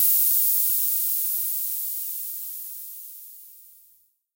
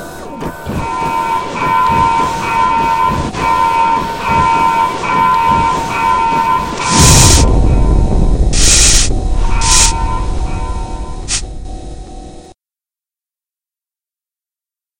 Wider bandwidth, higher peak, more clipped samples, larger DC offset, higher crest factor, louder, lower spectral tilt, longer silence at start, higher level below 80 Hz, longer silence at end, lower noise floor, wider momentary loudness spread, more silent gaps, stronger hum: second, 16.5 kHz vs over 20 kHz; second, -6 dBFS vs 0 dBFS; second, under 0.1% vs 0.3%; second, under 0.1% vs 1%; first, 18 dB vs 12 dB; second, -21 LUFS vs -11 LUFS; second, 7.5 dB/octave vs -3 dB/octave; about the same, 0 s vs 0 s; second, -86 dBFS vs -18 dBFS; second, 0.7 s vs 2.5 s; second, -61 dBFS vs under -90 dBFS; first, 20 LU vs 17 LU; neither; neither